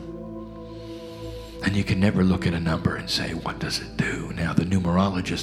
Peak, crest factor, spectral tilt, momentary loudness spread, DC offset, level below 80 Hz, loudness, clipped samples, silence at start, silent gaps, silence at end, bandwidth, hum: -4 dBFS; 20 dB; -6 dB/octave; 16 LU; under 0.1%; -42 dBFS; -24 LUFS; under 0.1%; 0 s; none; 0 s; 13.5 kHz; none